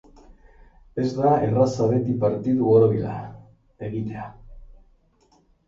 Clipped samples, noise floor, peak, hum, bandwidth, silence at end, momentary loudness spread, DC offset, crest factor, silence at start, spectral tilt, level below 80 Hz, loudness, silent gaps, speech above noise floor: under 0.1%; -61 dBFS; -4 dBFS; none; 7.6 kHz; 1.05 s; 18 LU; under 0.1%; 18 dB; 0.3 s; -9 dB/octave; -50 dBFS; -22 LUFS; none; 40 dB